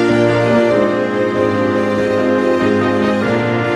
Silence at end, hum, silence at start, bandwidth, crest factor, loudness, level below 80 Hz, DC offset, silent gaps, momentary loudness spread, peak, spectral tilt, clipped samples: 0 s; none; 0 s; 11.5 kHz; 12 dB; -14 LUFS; -46 dBFS; under 0.1%; none; 3 LU; -2 dBFS; -7 dB/octave; under 0.1%